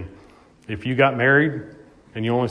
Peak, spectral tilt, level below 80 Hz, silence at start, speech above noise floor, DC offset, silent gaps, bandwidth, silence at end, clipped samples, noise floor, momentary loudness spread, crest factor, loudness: -4 dBFS; -8 dB/octave; -54 dBFS; 0 s; 30 dB; under 0.1%; none; 10 kHz; 0 s; under 0.1%; -50 dBFS; 19 LU; 18 dB; -20 LUFS